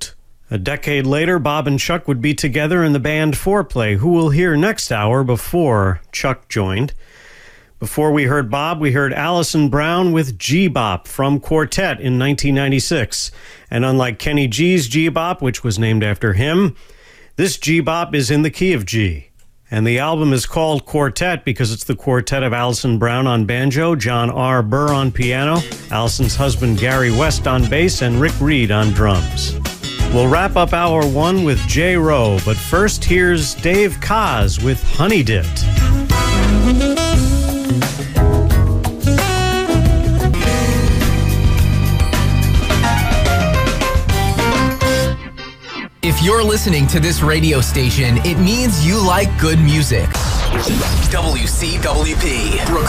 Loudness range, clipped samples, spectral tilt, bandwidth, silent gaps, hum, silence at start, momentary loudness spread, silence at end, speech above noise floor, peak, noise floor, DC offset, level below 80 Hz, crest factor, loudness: 3 LU; under 0.1%; -5.5 dB/octave; 16 kHz; none; none; 0 s; 6 LU; 0 s; 27 dB; -2 dBFS; -42 dBFS; under 0.1%; -22 dBFS; 12 dB; -16 LUFS